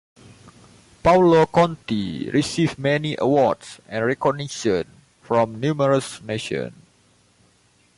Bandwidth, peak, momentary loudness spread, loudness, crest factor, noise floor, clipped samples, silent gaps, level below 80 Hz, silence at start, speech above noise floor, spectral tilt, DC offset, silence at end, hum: 11.5 kHz; -6 dBFS; 13 LU; -21 LUFS; 16 dB; -59 dBFS; under 0.1%; none; -50 dBFS; 0.45 s; 39 dB; -6 dB/octave; under 0.1%; 1.25 s; none